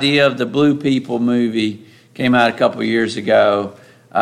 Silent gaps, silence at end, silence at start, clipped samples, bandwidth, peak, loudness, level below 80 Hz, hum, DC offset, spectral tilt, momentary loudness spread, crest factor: none; 0 s; 0 s; under 0.1%; 12 kHz; -2 dBFS; -16 LUFS; -62 dBFS; none; under 0.1%; -6 dB/octave; 8 LU; 14 dB